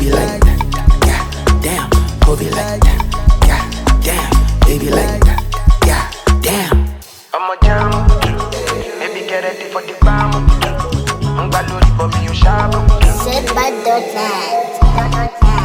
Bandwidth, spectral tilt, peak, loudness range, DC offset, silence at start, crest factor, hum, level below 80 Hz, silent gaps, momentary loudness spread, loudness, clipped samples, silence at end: 19 kHz; -5 dB/octave; 0 dBFS; 2 LU; under 0.1%; 0 s; 12 dB; none; -14 dBFS; none; 6 LU; -14 LUFS; under 0.1%; 0 s